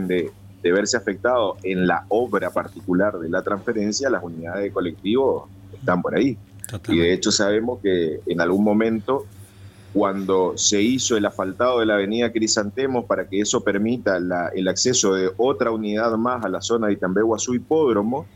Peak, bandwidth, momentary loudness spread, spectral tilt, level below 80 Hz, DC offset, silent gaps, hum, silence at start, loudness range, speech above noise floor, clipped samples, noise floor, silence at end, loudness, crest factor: -4 dBFS; 16 kHz; 7 LU; -4 dB/octave; -56 dBFS; under 0.1%; none; none; 0 s; 3 LU; 23 dB; under 0.1%; -43 dBFS; 0.1 s; -21 LUFS; 18 dB